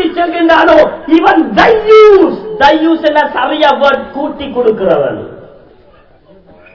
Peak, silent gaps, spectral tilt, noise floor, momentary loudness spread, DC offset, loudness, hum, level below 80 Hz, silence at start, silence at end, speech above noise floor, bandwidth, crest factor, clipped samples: 0 dBFS; none; -6 dB/octave; -43 dBFS; 12 LU; 0.3%; -8 LUFS; none; -40 dBFS; 0 s; 1.3 s; 35 dB; 6 kHz; 10 dB; 5%